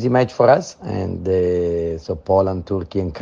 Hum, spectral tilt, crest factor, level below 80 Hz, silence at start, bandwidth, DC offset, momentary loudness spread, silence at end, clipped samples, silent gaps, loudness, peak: none; -7.5 dB/octave; 18 dB; -44 dBFS; 0 s; 7.4 kHz; under 0.1%; 10 LU; 0 s; under 0.1%; none; -19 LUFS; -2 dBFS